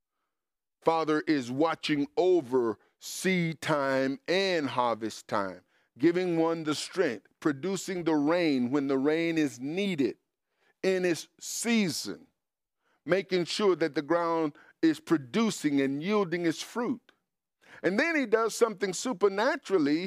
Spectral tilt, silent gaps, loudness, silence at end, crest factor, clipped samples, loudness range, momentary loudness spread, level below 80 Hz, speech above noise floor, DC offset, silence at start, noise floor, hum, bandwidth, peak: -4.5 dB/octave; none; -29 LUFS; 0 s; 20 dB; under 0.1%; 2 LU; 7 LU; -78 dBFS; over 62 dB; under 0.1%; 0.85 s; under -90 dBFS; none; 15.5 kHz; -10 dBFS